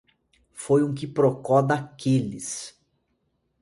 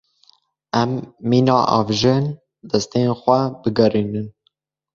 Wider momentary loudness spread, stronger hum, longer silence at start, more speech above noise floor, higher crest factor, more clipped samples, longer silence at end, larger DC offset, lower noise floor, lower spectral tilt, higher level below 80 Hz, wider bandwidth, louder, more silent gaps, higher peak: first, 13 LU vs 10 LU; neither; second, 0.55 s vs 0.75 s; about the same, 50 dB vs 49 dB; about the same, 20 dB vs 18 dB; neither; first, 0.9 s vs 0.65 s; neither; first, -73 dBFS vs -67 dBFS; about the same, -6.5 dB/octave vs -6.5 dB/octave; second, -62 dBFS vs -52 dBFS; first, 11.5 kHz vs 7.6 kHz; second, -24 LUFS vs -19 LUFS; neither; second, -6 dBFS vs -2 dBFS